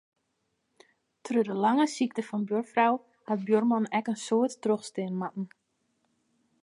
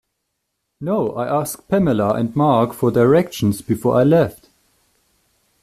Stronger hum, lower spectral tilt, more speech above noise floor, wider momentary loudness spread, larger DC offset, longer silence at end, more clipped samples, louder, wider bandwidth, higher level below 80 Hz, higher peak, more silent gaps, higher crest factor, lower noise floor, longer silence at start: neither; second, -5.5 dB/octave vs -7 dB/octave; second, 50 dB vs 58 dB; about the same, 9 LU vs 7 LU; neither; second, 1.15 s vs 1.3 s; neither; second, -28 LUFS vs -18 LUFS; second, 11.5 kHz vs 15 kHz; second, -84 dBFS vs -50 dBFS; second, -10 dBFS vs -2 dBFS; neither; about the same, 20 dB vs 16 dB; about the same, -78 dBFS vs -75 dBFS; first, 1.25 s vs 0.8 s